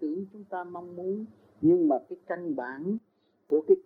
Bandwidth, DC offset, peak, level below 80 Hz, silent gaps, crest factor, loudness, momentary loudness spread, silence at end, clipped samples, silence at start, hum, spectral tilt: 3.3 kHz; under 0.1%; -10 dBFS; -76 dBFS; none; 18 dB; -30 LUFS; 14 LU; 0.05 s; under 0.1%; 0 s; none; -11 dB/octave